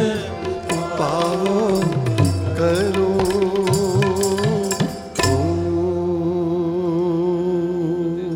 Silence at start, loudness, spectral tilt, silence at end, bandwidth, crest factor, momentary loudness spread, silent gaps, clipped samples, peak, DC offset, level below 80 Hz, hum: 0 s; -20 LUFS; -6 dB/octave; 0 s; 17.5 kHz; 14 dB; 5 LU; none; under 0.1%; -4 dBFS; under 0.1%; -44 dBFS; none